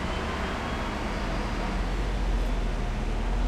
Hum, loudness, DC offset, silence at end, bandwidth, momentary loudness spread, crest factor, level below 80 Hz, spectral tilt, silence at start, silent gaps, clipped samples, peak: none; -31 LUFS; under 0.1%; 0 s; 11 kHz; 2 LU; 12 dB; -30 dBFS; -5.5 dB/octave; 0 s; none; under 0.1%; -16 dBFS